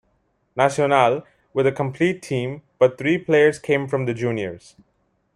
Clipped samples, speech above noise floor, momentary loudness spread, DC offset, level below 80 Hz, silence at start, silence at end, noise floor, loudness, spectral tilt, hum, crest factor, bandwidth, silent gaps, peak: under 0.1%; 47 dB; 11 LU; under 0.1%; -62 dBFS; 0.55 s; 0.8 s; -67 dBFS; -21 LUFS; -6 dB/octave; none; 18 dB; 11.5 kHz; none; -2 dBFS